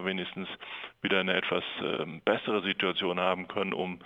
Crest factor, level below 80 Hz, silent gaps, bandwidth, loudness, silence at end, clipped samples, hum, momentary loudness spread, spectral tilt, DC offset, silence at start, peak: 20 dB; -72 dBFS; none; 8 kHz; -30 LUFS; 0 s; under 0.1%; none; 10 LU; -6.5 dB/octave; under 0.1%; 0 s; -10 dBFS